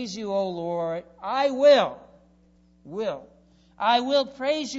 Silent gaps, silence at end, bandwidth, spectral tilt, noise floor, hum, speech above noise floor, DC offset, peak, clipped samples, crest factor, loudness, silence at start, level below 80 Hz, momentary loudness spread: none; 0 s; 8 kHz; -4 dB/octave; -59 dBFS; none; 35 dB; under 0.1%; -6 dBFS; under 0.1%; 18 dB; -24 LUFS; 0 s; -64 dBFS; 14 LU